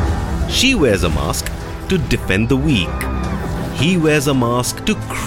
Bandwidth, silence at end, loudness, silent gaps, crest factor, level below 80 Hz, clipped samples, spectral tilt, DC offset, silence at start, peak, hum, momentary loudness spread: 17 kHz; 0 s; -17 LUFS; none; 14 dB; -26 dBFS; under 0.1%; -5 dB/octave; under 0.1%; 0 s; -2 dBFS; none; 9 LU